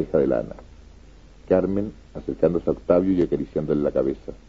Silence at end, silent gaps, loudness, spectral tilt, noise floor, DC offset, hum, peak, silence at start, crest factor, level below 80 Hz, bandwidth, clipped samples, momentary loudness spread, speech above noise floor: 0.1 s; none; -23 LUFS; -9.5 dB/octave; -47 dBFS; 0.2%; none; -4 dBFS; 0 s; 20 dB; -44 dBFS; 7.4 kHz; under 0.1%; 13 LU; 25 dB